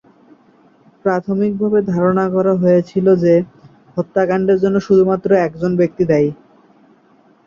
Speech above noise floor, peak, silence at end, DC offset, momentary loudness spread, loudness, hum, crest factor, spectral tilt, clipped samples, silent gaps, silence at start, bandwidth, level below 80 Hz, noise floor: 37 dB; -2 dBFS; 1.15 s; under 0.1%; 7 LU; -15 LUFS; none; 14 dB; -9 dB/octave; under 0.1%; none; 1.05 s; 7 kHz; -54 dBFS; -52 dBFS